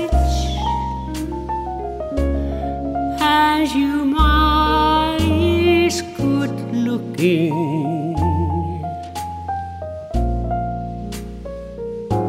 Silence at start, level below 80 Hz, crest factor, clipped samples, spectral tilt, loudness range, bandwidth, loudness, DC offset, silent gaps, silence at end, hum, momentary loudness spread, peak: 0 s; -26 dBFS; 18 dB; under 0.1%; -6 dB/octave; 8 LU; 16 kHz; -19 LUFS; under 0.1%; none; 0 s; none; 13 LU; -2 dBFS